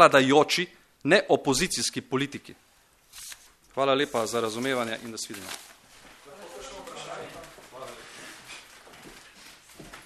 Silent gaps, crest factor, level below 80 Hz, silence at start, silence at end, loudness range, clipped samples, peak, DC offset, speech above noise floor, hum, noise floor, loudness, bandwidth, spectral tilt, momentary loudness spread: none; 26 dB; -60 dBFS; 0 s; 0.05 s; 16 LU; under 0.1%; -2 dBFS; under 0.1%; 37 dB; none; -61 dBFS; -25 LUFS; 13.5 kHz; -3.5 dB/octave; 26 LU